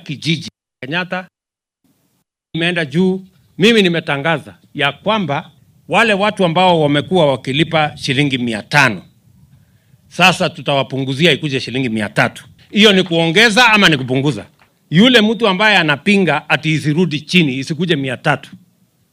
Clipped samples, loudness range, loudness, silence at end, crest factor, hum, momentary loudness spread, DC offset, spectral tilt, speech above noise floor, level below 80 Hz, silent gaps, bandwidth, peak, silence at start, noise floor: under 0.1%; 5 LU; -14 LUFS; 0.55 s; 16 dB; none; 11 LU; under 0.1%; -5 dB/octave; 73 dB; -54 dBFS; none; 16 kHz; 0 dBFS; 0.05 s; -87 dBFS